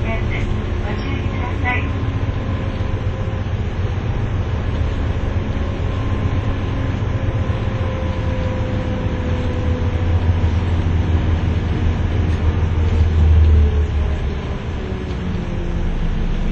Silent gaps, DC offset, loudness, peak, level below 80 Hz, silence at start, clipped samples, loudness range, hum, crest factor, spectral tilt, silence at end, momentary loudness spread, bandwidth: none; under 0.1%; -20 LUFS; -4 dBFS; -22 dBFS; 0 s; under 0.1%; 5 LU; none; 14 dB; -8 dB/octave; 0 s; 6 LU; 7 kHz